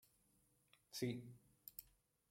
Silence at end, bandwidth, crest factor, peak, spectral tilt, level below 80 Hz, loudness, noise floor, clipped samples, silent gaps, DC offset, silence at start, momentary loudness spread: 0.45 s; 16.5 kHz; 24 dB; -30 dBFS; -5 dB/octave; -82 dBFS; -50 LUFS; -79 dBFS; under 0.1%; none; under 0.1%; 0.9 s; 14 LU